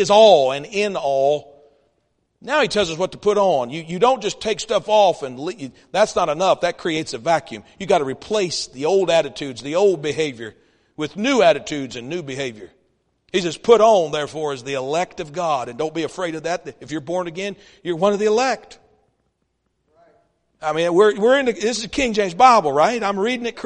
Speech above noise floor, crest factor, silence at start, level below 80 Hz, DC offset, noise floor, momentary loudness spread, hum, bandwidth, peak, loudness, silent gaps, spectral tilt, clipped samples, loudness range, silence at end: 52 dB; 20 dB; 0 s; -54 dBFS; under 0.1%; -71 dBFS; 14 LU; none; 10.5 kHz; 0 dBFS; -19 LUFS; none; -4 dB/octave; under 0.1%; 6 LU; 0 s